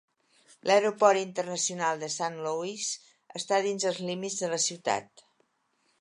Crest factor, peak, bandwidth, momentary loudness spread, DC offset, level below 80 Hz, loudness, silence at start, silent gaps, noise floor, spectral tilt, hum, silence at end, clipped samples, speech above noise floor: 22 dB; -8 dBFS; 11.5 kHz; 10 LU; under 0.1%; -82 dBFS; -29 LUFS; 0.65 s; none; -73 dBFS; -2.5 dB/octave; none; 0.95 s; under 0.1%; 44 dB